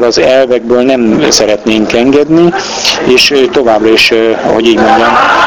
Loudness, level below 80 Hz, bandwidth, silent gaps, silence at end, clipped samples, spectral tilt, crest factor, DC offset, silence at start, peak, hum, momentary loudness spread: -7 LUFS; -38 dBFS; 19.5 kHz; none; 0 s; 2%; -3.5 dB/octave; 6 dB; 0.5%; 0 s; 0 dBFS; none; 4 LU